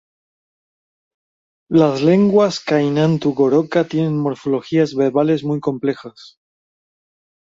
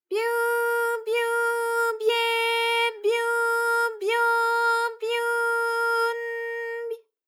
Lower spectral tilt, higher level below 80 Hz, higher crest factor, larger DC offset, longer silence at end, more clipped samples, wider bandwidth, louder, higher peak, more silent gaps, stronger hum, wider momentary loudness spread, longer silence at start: first, -7.5 dB/octave vs 2.5 dB/octave; first, -60 dBFS vs under -90 dBFS; about the same, 16 dB vs 12 dB; neither; first, 1.3 s vs 0.3 s; neither; second, 7.8 kHz vs 16.5 kHz; first, -17 LUFS vs -24 LUFS; first, -2 dBFS vs -12 dBFS; neither; neither; about the same, 7 LU vs 8 LU; first, 1.7 s vs 0.1 s